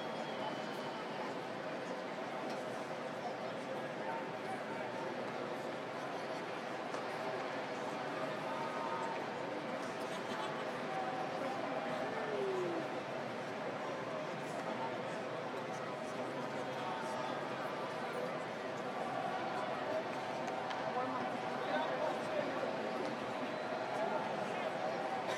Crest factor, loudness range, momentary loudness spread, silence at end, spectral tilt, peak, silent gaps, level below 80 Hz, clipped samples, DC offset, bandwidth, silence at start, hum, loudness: 16 dB; 3 LU; 4 LU; 0 s; -5 dB/octave; -24 dBFS; none; -88 dBFS; under 0.1%; under 0.1%; 15.5 kHz; 0 s; none; -40 LUFS